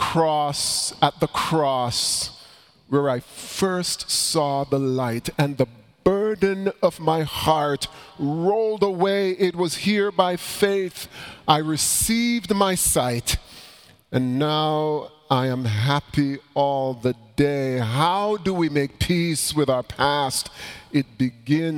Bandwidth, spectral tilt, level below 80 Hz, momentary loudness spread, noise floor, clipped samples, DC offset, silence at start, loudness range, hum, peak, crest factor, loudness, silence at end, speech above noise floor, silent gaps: 19 kHz; -4 dB/octave; -46 dBFS; 6 LU; -50 dBFS; under 0.1%; under 0.1%; 0 s; 2 LU; none; 0 dBFS; 22 dB; -22 LUFS; 0 s; 28 dB; none